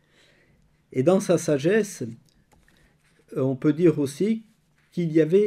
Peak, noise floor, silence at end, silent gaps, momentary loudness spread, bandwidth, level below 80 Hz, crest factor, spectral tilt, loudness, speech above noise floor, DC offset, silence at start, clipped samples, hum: -6 dBFS; -62 dBFS; 0 s; none; 14 LU; 14.5 kHz; -66 dBFS; 18 dB; -6.5 dB/octave; -23 LUFS; 40 dB; under 0.1%; 0.95 s; under 0.1%; none